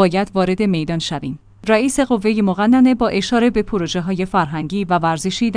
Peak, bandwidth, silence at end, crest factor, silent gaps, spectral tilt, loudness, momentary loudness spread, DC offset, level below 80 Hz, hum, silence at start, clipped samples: 0 dBFS; 10.5 kHz; 0 s; 16 dB; none; -5.5 dB/octave; -17 LUFS; 8 LU; under 0.1%; -42 dBFS; none; 0 s; under 0.1%